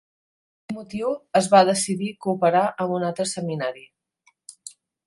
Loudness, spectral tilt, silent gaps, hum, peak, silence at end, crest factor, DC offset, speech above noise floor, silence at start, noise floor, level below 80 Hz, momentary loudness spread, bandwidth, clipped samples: -22 LUFS; -4.5 dB/octave; none; none; -2 dBFS; 0.4 s; 22 dB; under 0.1%; 43 dB; 0.7 s; -65 dBFS; -68 dBFS; 24 LU; 11.5 kHz; under 0.1%